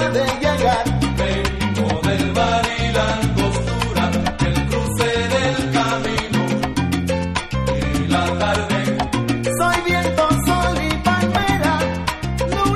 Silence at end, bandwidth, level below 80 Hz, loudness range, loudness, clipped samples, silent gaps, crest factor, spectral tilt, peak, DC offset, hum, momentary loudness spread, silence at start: 0 s; 15 kHz; -30 dBFS; 2 LU; -19 LUFS; under 0.1%; none; 14 dB; -5 dB/octave; -4 dBFS; under 0.1%; none; 4 LU; 0 s